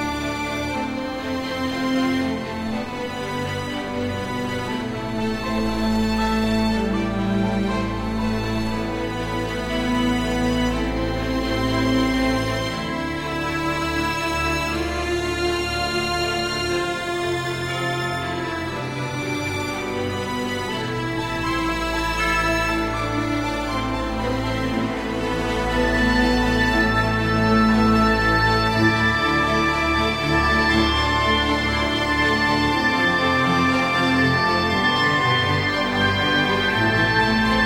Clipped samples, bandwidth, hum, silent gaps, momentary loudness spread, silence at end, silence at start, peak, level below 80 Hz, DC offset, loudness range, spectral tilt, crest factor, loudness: under 0.1%; 16 kHz; none; none; 8 LU; 0 s; 0 s; -4 dBFS; -34 dBFS; under 0.1%; 7 LU; -5 dB/octave; 18 dB; -21 LUFS